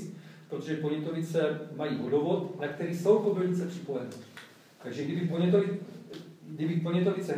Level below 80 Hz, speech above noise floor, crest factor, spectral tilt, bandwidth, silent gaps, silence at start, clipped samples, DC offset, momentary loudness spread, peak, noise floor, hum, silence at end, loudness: -84 dBFS; 22 dB; 18 dB; -7.5 dB/octave; 15 kHz; none; 0 s; under 0.1%; under 0.1%; 20 LU; -12 dBFS; -51 dBFS; none; 0 s; -30 LUFS